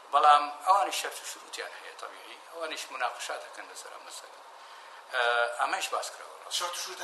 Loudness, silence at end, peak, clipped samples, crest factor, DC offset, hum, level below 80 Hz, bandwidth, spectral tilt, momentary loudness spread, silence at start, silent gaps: -29 LUFS; 0 s; -8 dBFS; under 0.1%; 22 dB; under 0.1%; none; under -90 dBFS; 13 kHz; 2 dB/octave; 21 LU; 0 s; none